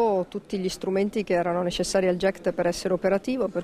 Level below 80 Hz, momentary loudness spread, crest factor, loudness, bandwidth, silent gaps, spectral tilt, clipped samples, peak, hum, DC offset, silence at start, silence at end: -52 dBFS; 5 LU; 14 dB; -26 LUFS; 14.5 kHz; none; -5 dB/octave; under 0.1%; -10 dBFS; none; under 0.1%; 0 s; 0 s